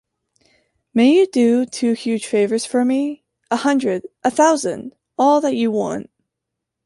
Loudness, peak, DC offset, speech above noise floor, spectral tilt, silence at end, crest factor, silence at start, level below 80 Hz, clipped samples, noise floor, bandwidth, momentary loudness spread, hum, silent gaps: -18 LUFS; -2 dBFS; under 0.1%; 64 dB; -4.5 dB/octave; 0.8 s; 16 dB; 0.95 s; -66 dBFS; under 0.1%; -81 dBFS; 11.5 kHz; 11 LU; none; none